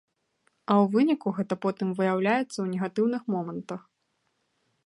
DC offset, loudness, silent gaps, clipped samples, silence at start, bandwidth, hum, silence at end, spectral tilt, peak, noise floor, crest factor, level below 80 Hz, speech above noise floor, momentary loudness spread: under 0.1%; -27 LUFS; none; under 0.1%; 0.7 s; 11 kHz; none; 1.05 s; -7 dB/octave; -8 dBFS; -75 dBFS; 20 dB; -78 dBFS; 49 dB; 13 LU